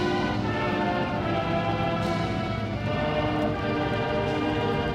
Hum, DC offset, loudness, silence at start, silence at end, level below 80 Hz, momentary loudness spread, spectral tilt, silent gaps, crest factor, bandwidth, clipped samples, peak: none; under 0.1%; -27 LUFS; 0 s; 0 s; -42 dBFS; 2 LU; -7 dB/octave; none; 14 dB; 12 kHz; under 0.1%; -12 dBFS